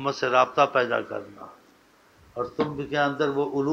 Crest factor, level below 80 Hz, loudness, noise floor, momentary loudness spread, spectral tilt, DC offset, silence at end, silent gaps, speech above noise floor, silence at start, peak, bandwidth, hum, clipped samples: 20 dB; -62 dBFS; -25 LUFS; -58 dBFS; 17 LU; -5.5 dB/octave; under 0.1%; 0 s; none; 33 dB; 0 s; -6 dBFS; 8.6 kHz; none; under 0.1%